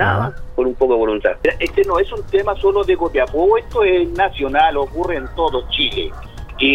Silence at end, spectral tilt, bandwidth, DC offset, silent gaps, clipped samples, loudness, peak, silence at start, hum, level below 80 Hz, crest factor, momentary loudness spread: 0 s; -6.5 dB/octave; 9.2 kHz; under 0.1%; none; under 0.1%; -17 LUFS; -2 dBFS; 0 s; none; -32 dBFS; 16 dB; 6 LU